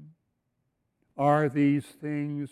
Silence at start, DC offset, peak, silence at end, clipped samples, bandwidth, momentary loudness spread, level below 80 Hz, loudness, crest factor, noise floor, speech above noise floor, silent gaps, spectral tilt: 0 s; under 0.1%; -10 dBFS; 0.05 s; under 0.1%; 12 kHz; 10 LU; -70 dBFS; -27 LUFS; 18 dB; -78 dBFS; 52 dB; none; -8.5 dB/octave